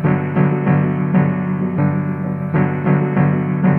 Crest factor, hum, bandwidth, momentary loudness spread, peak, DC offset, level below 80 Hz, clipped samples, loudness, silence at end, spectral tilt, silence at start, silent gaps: 12 dB; none; 3.3 kHz; 4 LU; -4 dBFS; under 0.1%; -50 dBFS; under 0.1%; -17 LUFS; 0 s; -12 dB/octave; 0 s; none